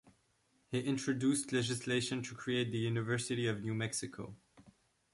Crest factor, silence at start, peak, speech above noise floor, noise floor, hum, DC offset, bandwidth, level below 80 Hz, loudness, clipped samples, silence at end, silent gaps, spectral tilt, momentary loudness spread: 16 dB; 0.05 s; -22 dBFS; 39 dB; -75 dBFS; none; under 0.1%; 11.5 kHz; -70 dBFS; -36 LUFS; under 0.1%; 0.45 s; none; -4.5 dB/octave; 7 LU